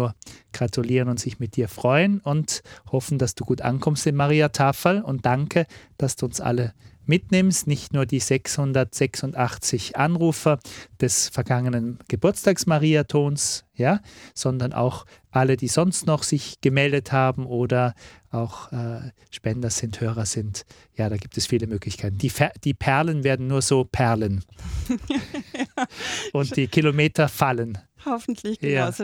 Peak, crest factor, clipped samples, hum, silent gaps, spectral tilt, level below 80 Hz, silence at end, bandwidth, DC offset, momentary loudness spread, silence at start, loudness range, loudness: -2 dBFS; 22 dB; under 0.1%; none; none; -5 dB/octave; -48 dBFS; 0 s; 18 kHz; under 0.1%; 10 LU; 0 s; 4 LU; -23 LUFS